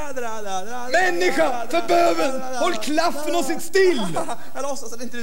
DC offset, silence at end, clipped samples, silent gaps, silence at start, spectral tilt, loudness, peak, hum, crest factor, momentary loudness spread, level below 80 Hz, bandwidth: 8%; 0 s; under 0.1%; none; 0 s; -3.5 dB/octave; -22 LUFS; -6 dBFS; none; 14 dB; 11 LU; -60 dBFS; 16.5 kHz